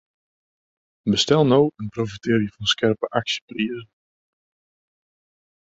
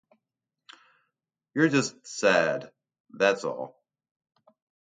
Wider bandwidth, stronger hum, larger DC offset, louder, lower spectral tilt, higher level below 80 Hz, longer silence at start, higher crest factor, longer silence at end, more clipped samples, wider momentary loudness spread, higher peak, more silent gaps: second, 8.2 kHz vs 9.6 kHz; neither; neither; first, -21 LUFS vs -26 LUFS; about the same, -5 dB/octave vs -4.5 dB/octave; first, -56 dBFS vs -76 dBFS; second, 1.05 s vs 1.55 s; about the same, 20 dB vs 22 dB; first, 1.85 s vs 1.25 s; neither; about the same, 11 LU vs 13 LU; about the same, -4 dBFS vs -6 dBFS; about the same, 3.42-3.48 s vs 3.00-3.04 s